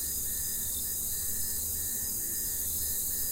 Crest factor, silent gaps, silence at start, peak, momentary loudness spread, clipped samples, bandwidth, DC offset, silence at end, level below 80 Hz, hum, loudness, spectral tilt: 14 dB; none; 0 s; -18 dBFS; 1 LU; under 0.1%; 16 kHz; under 0.1%; 0 s; -48 dBFS; none; -30 LUFS; -1 dB/octave